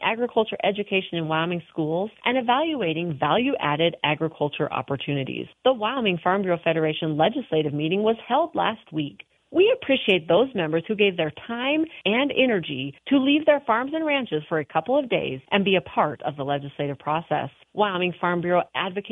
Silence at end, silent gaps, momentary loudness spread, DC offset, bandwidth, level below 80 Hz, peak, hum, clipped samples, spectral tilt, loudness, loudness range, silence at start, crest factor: 0 s; none; 8 LU; under 0.1%; 3.9 kHz; -64 dBFS; -6 dBFS; none; under 0.1%; -8.5 dB/octave; -24 LUFS; 2 LU; 0 s; 18 dB